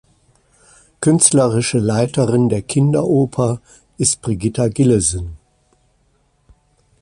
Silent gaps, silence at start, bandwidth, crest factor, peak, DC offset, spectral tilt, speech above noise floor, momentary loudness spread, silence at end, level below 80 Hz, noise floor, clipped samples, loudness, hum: none; 1 s; 11.5 kHz; 18 dB; 0 dBFS; under 0.1%; -5.5 dB/octave; 44 dB; 9 LU; 1.65 s; -42 dBFS; -60 dBFS; under 0.1%; -16 LUFS; none